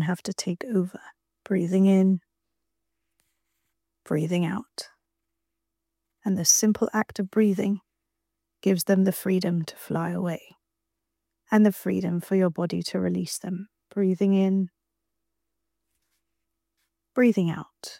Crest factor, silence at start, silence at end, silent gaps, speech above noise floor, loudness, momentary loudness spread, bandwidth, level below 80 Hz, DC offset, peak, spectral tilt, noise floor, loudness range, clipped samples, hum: 22 dB; 0 s; 0.05 s; none; 60 dB; -25 LUFS; 13 LU; 16.5 kHz; -70 dBFS; under 0.1%; -4 dBFS; -5 dB/octave; -84 dBFS; 5 LU; under 0.1%; none